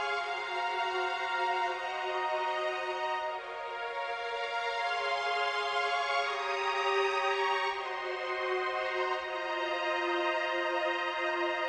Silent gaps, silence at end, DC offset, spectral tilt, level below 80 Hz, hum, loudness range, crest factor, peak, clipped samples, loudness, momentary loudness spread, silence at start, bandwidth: none; 0 s; under 0.1%; -1.5 dB/octave; -72 dBFS; none; 3 LU; 14 dB; -18 dBFS; under 0.1%; -32 LUFS; 6 LU; 0 s; 11 kHz